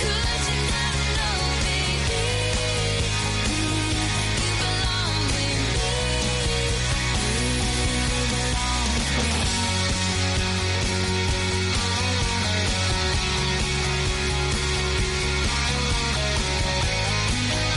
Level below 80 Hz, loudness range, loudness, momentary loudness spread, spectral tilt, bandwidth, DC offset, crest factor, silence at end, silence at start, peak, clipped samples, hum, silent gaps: -30 dBFS; 0 LU; -23 LUFS; 1 LU; -3.5 dB/octave; 11.5 kHz; under 0.1%; 12 dB; 0 s; 0 s; -10 dBFS; under 0.1%; none; none